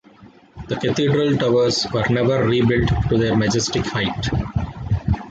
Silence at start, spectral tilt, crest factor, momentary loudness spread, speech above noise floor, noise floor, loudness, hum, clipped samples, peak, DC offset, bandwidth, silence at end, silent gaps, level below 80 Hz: 0.2 s; -5.5 dB/octave; 14 dB; 7 LU; 28 dB; -47 dBFS; -19 LUFS; none; under 0.1%; -6 dBFS; under 0.1%; 9 kHz; 0 s; none; -34 dBFS